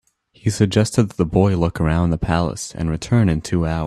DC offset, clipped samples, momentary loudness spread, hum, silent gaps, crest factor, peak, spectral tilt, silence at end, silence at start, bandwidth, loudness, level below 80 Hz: under 0.1%; under 0.1%; 8 LU; none; none; 18 dB; 0 dBFS; -6.5 dB/octave; 0 s; 0.45 s; 13 kHz; -19 LUFS; -36 dBFS